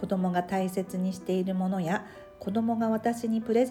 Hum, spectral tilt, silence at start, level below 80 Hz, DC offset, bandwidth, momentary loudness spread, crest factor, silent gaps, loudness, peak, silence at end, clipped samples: none; -7 dB/octave; 0 s; -64 dBFS; under 0.1%; 14 kHz; 5 LU; 16 dB; none; -29 LUFS; -14 dBFS; 0 s; under 0.1%